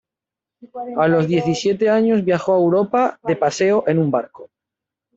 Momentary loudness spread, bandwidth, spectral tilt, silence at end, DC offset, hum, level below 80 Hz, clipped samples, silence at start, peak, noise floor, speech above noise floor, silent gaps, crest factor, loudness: 8 LU; 8 kHz; -6.5 dB/octave; 0.7 s; under 0.1%; none; -60 dBFS; under 0.1%; 0.65 s; -4 dBFS; -87 dBFS; 70 dB; none; 14 dB; -18 LUFS